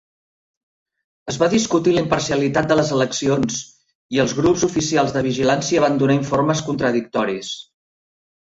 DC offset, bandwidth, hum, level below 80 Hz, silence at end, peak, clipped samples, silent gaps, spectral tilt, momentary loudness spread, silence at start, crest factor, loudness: under 0.1%; 8 kHz; none; -50 dBFS; 0.8 s; -2 dBFS; under 0.1%; 3.95-4.09 s; -5 dB/octave; 7 LU; 1.25 s; 16 dB; -19 LUFS